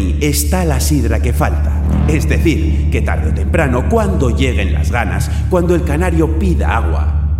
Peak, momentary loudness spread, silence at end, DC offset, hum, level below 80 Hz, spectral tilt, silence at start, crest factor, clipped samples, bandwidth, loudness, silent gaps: 0 dBFS; 3 LU; 0 s; under 0.1%; none; -18 dBFS; -6 dB/octave; 0 s; 12 dB; under 0.1%; 15.5 kHz; -14 LUFS; none